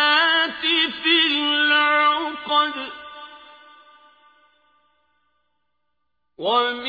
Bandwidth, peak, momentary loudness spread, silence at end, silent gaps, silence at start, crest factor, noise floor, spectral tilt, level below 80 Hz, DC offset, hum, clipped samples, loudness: 5 kHz; -6 dBFS; 17 LU; 0 s; none; 0 s; 18 dB; -78 dBFS; -3 dB/octave; -68 dBFS; under 0.1%; 60 Hz at -85 dBFS; under 0.1%; -18 LUFS